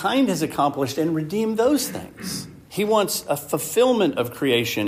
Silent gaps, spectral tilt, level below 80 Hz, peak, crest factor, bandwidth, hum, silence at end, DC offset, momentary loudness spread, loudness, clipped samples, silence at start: none; -4.5 dB/octave; -58 dBFS; -6 dBFS; 14 dB; 15.5 kHz; none; 0 s; under 0.1%; 11 LU; -22 LUFS; under 0.1%; 0 s